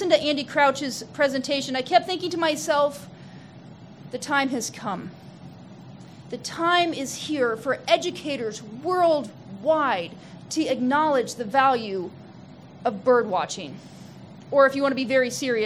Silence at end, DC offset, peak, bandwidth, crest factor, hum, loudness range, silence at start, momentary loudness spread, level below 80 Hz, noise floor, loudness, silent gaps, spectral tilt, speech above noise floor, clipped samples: 0 s; under 0.1%; -6 dBFS; 15.5 kHz; 20 dB; none; 4 LU; 0 s; 23 LU; -68 dBFS; -45 dBFS; -24 LUFS; none; -3.5 dB/octave; 21 dB; under 0.1%